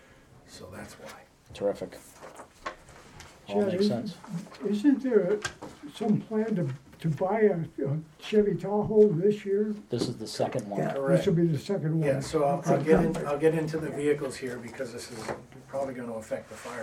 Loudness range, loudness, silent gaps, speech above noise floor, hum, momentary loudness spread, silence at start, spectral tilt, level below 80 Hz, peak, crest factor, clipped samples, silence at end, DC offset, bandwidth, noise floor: 7 LU; -28 LUFS; none; 27 dB; none; 19 LU; 0.5 s; -7 dB/octave; -58 dBFS; -8 dBFS; 22 dB; under 0.1%; 0 s; under 0.1%; 14.5 kHz; -55 dBFS